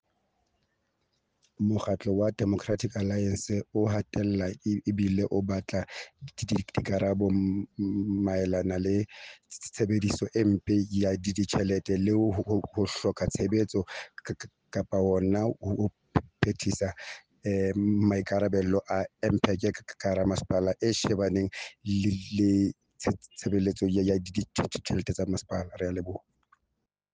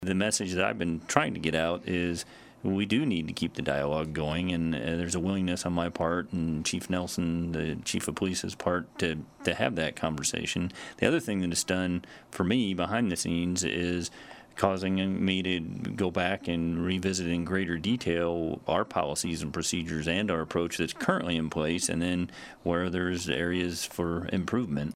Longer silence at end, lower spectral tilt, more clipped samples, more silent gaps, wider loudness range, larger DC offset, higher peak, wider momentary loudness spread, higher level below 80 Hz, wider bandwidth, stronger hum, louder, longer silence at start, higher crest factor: first, 0.95 s vs 0 s; first, -6.5 dB/octave vs -4.5 dB/octave; neither; neither; about the same, 2 LU vs 2 LU; neither; second, -8 dBFS vs -2 dBFS; first, 9 LU vs 5 LU; about the same, -54 dBFS vs -52 dBFS; second, 9.8 kHz vs 16 kHz; neither; about the same, -29 LUFS vs -30 LUFS; first, 1.6 s vs 0 s; second, 20 dB vs 28 dB